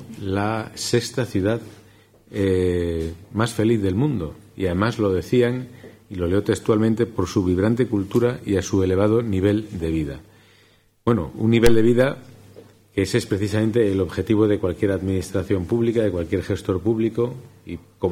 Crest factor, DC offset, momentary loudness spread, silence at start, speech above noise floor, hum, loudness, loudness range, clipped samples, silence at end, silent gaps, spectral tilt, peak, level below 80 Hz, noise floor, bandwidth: 20 dB; under 0.1%; 9 LU; 0 s; 36 dB; none; -22 LUFS; 3 LU; under 0.1%; 0 s; none; -6.5 dB/octave; 0 dBFS; -42 dBFS; -57 dBFS; 16 kHz